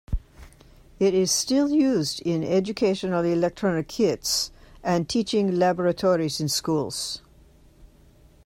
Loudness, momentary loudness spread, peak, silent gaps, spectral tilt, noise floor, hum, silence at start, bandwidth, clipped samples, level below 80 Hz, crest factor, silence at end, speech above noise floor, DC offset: -24 LUFS; 8 LU; -10 dBFS; none; -4.5 dB/octave; -54 dBFS; none; 0.1 s; 16 kHz; under 0.1%; -44 dBFS; 14 dB; 0.6 s; 31 dB; under 0.1%